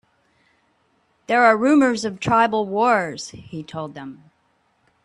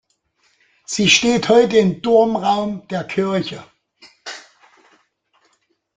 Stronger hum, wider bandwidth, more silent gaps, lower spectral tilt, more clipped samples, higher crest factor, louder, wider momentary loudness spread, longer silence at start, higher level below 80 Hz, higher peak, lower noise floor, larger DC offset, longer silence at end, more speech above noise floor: neither; first, 11 kHz vs 9.4 kHz; neither; about the same, -5 dB/octave vs -4 dB/octave; neither; about the same, 20 dB vs 20 dB; about the same, -18 LUFS vs -16 LUFS; second, 18 LU vs 21 LU; first, 1.3 s vs 0.9 s; about the same, -60 dBFS vs -56 dBFS; about the same, -2 dBFS vs 0 dBFS; about the same, -65 dBFS vs -65 dBFS; neither; second, 0.9 s vs 1.55 s; about the same, 46 dB vs 49 dB